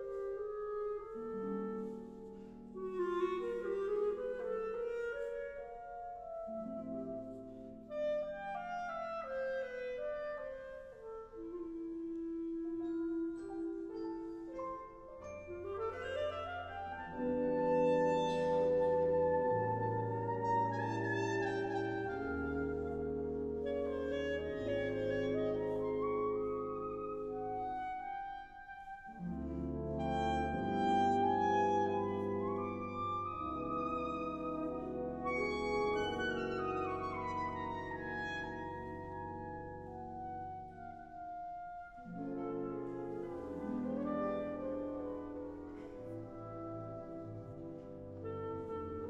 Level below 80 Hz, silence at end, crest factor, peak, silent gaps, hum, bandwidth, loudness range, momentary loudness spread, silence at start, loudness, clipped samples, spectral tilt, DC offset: -60 dBFS; 0 s; 16 dB; -22 dBFS; none; none; 8.4 kHz; 10 LU; 14 LU; 0 s; -39 LUFS; under 0.1%; -7 dB/octave; under 0.1%